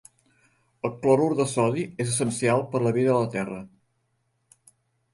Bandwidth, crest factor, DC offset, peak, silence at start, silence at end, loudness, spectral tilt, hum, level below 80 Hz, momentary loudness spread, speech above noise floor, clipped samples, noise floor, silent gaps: 11.5 kHz; 18 dB; under 0.1%; -8 dBFS; 0.85 s; 1.5 s; -24 LUFS; -5.5 dB/octave; none; -64 dBFS; 12 LU; 49 dB; under 0.1%; -73 dBFS; none